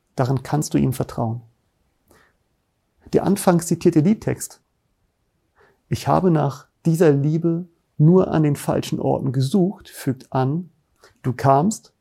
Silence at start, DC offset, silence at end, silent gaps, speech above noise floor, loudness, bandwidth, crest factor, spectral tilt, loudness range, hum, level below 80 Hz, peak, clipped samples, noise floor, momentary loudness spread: 0.15 s; under 0.1%; 0.2 s; none; 50 dB; -20 LUFS; 15.5 kHz; 20 dB; -7 dB/octave; 4 LU; none; -52 dBFS; -2 dBFS; under 0.1%; -69 dBFS; 12 LU